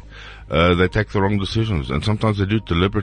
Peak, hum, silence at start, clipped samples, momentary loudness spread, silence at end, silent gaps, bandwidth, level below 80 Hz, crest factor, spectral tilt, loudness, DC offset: -4 dBFS; none; 0.05 s; under 0.1%; 6 LU; 0 s; none; 10 kHz; -32 dBFS; 16 dB; -7 dB/octave; -19 LUFS; under 0.1%